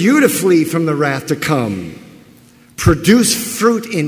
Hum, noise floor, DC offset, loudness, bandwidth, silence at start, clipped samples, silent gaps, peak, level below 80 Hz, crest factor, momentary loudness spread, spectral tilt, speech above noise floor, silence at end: none; -45 dBFS; under 0.1%; -14 LUFS; 16 kHz; 0 s; under 0.1%; none; 0 dBFS; -36 dBFS; 14 dB; 11 LU; -5 dB/octave; 31 dB; 0 s